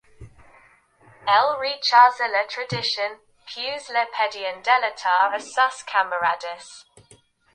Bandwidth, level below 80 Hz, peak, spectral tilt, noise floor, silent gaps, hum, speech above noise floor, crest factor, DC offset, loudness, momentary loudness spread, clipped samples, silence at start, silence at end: 10.5 kHz; -62 dBFS; -2 dBFS; -2 dB/octave; -56 dBFS; none; none; 34 dB; 22 dB; under 0.1%; -21 LUFS; 14 LU; under 0.1%; 0.2 s; 0.75 s